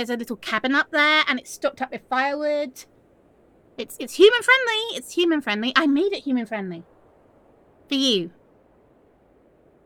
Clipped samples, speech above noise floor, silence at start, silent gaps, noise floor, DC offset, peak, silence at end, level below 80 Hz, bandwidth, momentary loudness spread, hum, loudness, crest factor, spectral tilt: under 0.1%; 35 dB; 0 s; none; -57 dBFS; under 0.1%; -2 dBFS; 1.55 s; -68 dBFS; 18 kHz; 16 LU; none; -21 LUFS; 22 dB; -3 dB/octave